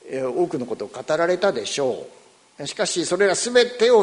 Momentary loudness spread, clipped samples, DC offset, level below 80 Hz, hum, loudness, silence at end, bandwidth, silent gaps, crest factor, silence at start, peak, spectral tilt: 13 LU; under 0.1%; under 0.1%; -66 dBFS; none; -21 LUFS; 0 s; 11 kHz; none; 18 dB; 0.05 s; -2 dBFS; -3 dB/octave